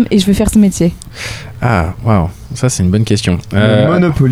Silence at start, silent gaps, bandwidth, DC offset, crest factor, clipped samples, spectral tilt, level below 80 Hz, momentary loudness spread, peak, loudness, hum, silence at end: 0 s; none; 15.5 kHz; under 0.1%; 12 dB; under 0.1%; -6 dB/octave; -28 dBFS; 11 LU; 0 dBFS; -12 LUFS; none; 0 s